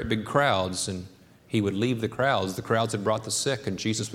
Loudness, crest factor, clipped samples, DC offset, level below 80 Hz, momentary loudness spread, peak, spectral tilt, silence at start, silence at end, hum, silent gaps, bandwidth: -26 LUFS; 20 dB; under 0.1%; under 0.1%; -54 dBFS; 6 LU; -6 dBFS; -4.5 dB/octave; 0 s; 0 s; none; none; 16.5 kHz